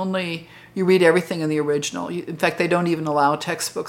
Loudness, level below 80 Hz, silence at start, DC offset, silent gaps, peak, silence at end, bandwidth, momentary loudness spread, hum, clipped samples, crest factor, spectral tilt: -21 LUFS; -64 dBFS; 0 s; under 0.1%; none; -2 dBFS; 0 s; 17 kHz; 13 LU; none; under 0.1%; 20 dB; -5 dB/octave